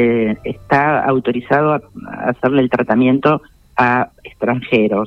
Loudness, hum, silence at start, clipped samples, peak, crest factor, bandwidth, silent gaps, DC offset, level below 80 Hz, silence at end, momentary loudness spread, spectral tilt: -16 LUFS; none; 0 s; under 0.1%; -2 dBFS; 14 dB; 6.2 kHz; none; under 0.1%; -48 dBFS; 0 s; 9 LU; -8.5 dB/octave